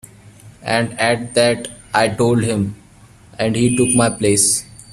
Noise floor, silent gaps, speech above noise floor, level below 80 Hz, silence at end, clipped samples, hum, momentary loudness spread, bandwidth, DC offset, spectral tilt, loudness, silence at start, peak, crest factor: -45 dBFS; none; 29 dB; -48 dBFS; 0 s; under 0.1%; none; 8 LU; 14.5 kHz; under 0.1%; -4 dB/octave; -16 LUFS; 0.25 s; 0 dBFS; 18 dB